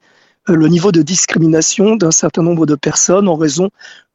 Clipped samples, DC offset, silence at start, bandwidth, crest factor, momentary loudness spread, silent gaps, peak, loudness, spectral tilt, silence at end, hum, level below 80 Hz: under 0.1%; under 0.1%; 0.45 s; 8.2 kHz; 12 dB; 5 LU; none; 0 dBFS; -11 LUFS; -4.5 dB/octave; 0.25 s; none; -50 dBFS